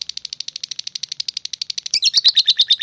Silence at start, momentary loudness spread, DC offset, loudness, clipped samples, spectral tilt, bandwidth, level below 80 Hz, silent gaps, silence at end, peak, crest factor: 1.95 s; 15 LU; under 0.1%; -17 LUFS; under 0.1%; 4 dB/octave; 10.5 kHz; -72 dBFS; none; 0 s; -4 dBFS; 16 dB